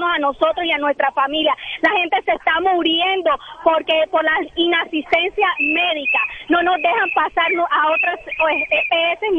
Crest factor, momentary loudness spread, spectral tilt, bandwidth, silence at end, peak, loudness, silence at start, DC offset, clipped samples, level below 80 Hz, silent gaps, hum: 16 dB; 3 LU; -4 dB/octave; 6.8 kHz; 0 s; -2 dBFS; -17 LUFS; 0 s; under 0.1%; under 0.1%; -52 dBFS; none; none